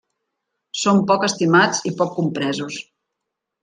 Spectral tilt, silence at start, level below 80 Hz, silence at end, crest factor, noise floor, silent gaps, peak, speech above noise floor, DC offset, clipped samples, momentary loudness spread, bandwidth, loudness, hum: -4.5 dB/octave; 0.75 s; -64 dBFS; 0.8 s; 18 dB; -81 dBFS; none; -2 dBFS; 62 dB; under 0.1%; under 0.1%; 14 LU; 9.6 kHz; -18 LUFS; none